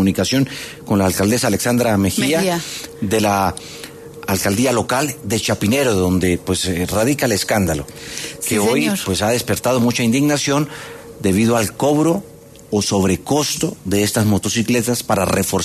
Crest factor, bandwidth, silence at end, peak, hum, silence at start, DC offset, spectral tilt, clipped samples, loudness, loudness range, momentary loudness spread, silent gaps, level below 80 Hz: 14 dB; 14 kHz; 0 s; -4 dBFS; none; 0 s; under 0.1%; -4.5 dB/octave; under 0.1%; -17 LUFS; 1 LU; 8 LU; none; -44 dBFS